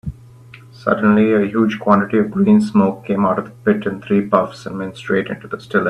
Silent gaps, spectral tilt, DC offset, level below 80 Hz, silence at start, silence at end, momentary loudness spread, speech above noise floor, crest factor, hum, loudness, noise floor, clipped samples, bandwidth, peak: none; -8 dB/octave; under 0.1%; -48 dBFS; 0.05 s; 0 s; 13 LU; 25 dB; 16 dB; none; -17 LUFS; -41 dBFS; under 0.1%; 8.6 kHz; 0 dBFS